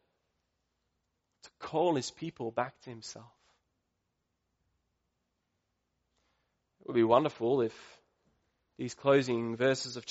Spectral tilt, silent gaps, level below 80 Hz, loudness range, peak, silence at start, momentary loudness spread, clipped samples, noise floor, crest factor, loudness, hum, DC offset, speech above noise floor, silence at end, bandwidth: -4.5 dB/octave; none; -76 dBFS; 13 LU; -10 dBFS; 1.45 s; 19 LU; under 0.1%; -82 dBFS; 24 dB; -31 LUFS; none; under 0.1%; 51 dB; 0 s; 8 kHz